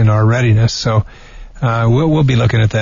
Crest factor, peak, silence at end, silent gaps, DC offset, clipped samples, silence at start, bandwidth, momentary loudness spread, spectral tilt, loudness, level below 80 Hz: 10 dB; -2 dBFS; 0 s; none; under 0.1%; under 0.1%; 0 s; 7.4 kHz; 6 LU; -6.5 dB/octave; -13 LUFS; -32 dBFS